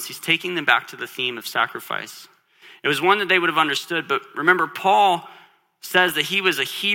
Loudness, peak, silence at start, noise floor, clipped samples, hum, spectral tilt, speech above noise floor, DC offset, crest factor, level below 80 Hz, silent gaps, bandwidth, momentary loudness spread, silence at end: -20 LUFS; 0 dBFS; 0 s; -50 dBFS; under 0.1%; none; -3 dB/octave; 29 dB; under 0.1%; 20 dB; -74 dBFS; none; 17.5 kHz; 10 LU; 0 s